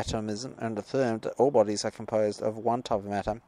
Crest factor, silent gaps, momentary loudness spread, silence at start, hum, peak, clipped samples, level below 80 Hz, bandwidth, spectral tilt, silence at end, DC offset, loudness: 18 dB; none; 10 LU; 0 s; none; -10 dBFS; under 0.1%; -54 dBFS; 11.5 kHz; -5.5 dB/octave; 0.1 s; under 0.1%; -29 LUFS